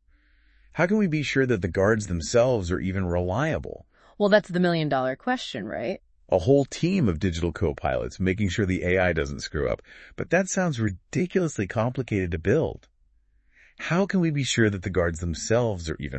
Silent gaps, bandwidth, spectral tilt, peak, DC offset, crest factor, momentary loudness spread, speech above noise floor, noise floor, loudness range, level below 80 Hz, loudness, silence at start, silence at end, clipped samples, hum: none; 8.8 kHz; -6 dB/octave; -4 dBFS; under 0.1%; 20 dB; 9 LU; 38 dB; -63 dBFS; 3 LU; -46 dBFS; -25 LUFS; 0.75 s; 0 s; under 0.1%; none